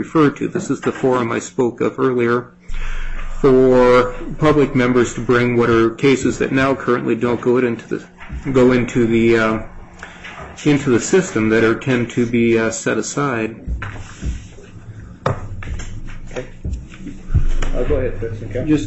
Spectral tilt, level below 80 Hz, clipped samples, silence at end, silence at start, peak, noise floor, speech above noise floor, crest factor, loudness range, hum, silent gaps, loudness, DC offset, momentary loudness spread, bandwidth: -6 dB/octave; -28 dBFS; under 0.1%; 0 s; 0 s; -2 dBFS; -36 dBFS; 20 dB; 14 dB; 11 LU; none; none; -17 LUFS; under 0.1%; 18 LU; 8.4 kHz